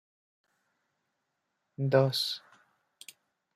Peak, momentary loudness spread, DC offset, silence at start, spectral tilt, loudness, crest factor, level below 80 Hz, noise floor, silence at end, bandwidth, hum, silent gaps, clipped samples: -10 dBFS; 25 LU; under 0.1%; 1.8 s; -5.5 dB/octave; -29 LUFS; 24 dB; -78 dBFS; -82 dBFS; 1.15 s; 15 kHz; none; none; under 0.1%